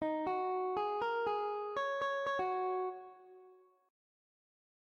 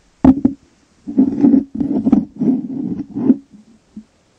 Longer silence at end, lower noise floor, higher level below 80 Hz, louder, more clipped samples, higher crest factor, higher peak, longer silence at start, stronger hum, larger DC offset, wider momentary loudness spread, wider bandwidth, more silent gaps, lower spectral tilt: first, 1.35 s vs 0.4 s; first, -63 dBFS vs -53 dBFS; second, -78 dBFS vs -40 dBFS; second, -37 LUFS vs -16 LUFS; neither; about the same, 14 dB vs 16 dB; second, -24 dBFS vs 0 dBFS; second, 0 s vs 0.25 s; neither; neither; second, 4 LU vs 11 LU; first, 7.4 kHz vs 3.5 kHz; neither; second, -5 dB/octave vs -10.5 dB/octave